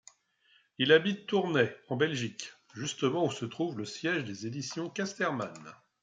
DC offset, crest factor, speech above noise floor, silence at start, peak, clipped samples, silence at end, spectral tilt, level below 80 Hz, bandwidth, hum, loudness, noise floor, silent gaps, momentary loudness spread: under 0.1%; 22 dB; 37 dB; 0.8 s; -10 dBFS; under 0.1%; 0.3 s; -4.5 dB/octave; -76 dBFS; 9.4 kHz; none; -31 LUFS; -68 dBFS; none; 14 LU